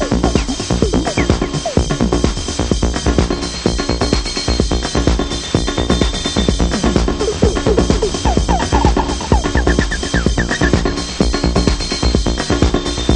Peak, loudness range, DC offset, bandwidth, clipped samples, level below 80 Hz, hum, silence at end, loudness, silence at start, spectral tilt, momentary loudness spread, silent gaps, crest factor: 0 dBFS; 2 LU; 0.1%; 10 kHz; under 0.1%; -20 dBFS; none; 0 s; -16 LUFS; 0 s; -5 dB/octave; 3 LU; none; 14 dB